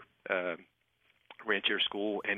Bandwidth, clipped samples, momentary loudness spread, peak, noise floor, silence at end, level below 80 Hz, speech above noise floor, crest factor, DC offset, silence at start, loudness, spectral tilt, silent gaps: 4.7 kHz; under 0.1%; 13 LU; -14 dBFS; -73 dBFS; 0 s; -78 dBFS; 40 dB; 20 dB; under 0.1%; 0 s; -32 LUFS; -5.5 dB/octave; none